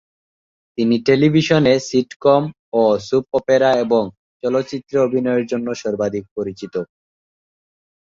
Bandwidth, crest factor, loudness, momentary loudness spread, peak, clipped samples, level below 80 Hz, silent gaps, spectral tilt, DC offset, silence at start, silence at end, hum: 7.6 kHz; 16 dB; -18 LUFS; 13 LU; -2 dBFS; under 0.1%; -56 dBFS; 2.16-2.20 s, 2.59-2.72 s, 4.17-4.40 s, 6.31-6.36 s; -6 dB/octave; under 0.1%; 0.8 s; 1.25 s; none